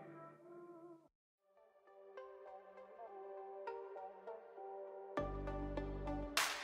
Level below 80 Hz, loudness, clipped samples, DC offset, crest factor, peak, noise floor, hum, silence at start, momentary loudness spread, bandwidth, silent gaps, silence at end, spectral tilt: -56 dBFS; -47 LUFS; under 0.1%; under 0.1%; 28 dB; -20 dBFS; -71 dBFS; none; 0 s; 15 LU; 12.5 kHz; 1.15-1.38 s; 0 s; -3.5 dB/octave